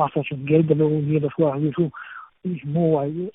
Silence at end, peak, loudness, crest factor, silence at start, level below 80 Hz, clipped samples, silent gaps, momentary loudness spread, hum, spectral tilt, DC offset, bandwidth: 0.05 s; -4 dBFS; -22 LUFS; 16 dB; 0 s; -62 dBFS; under 0.1%; none; 12 LU; none; -13 dB/octave; under 0.1%; 3.9 kHz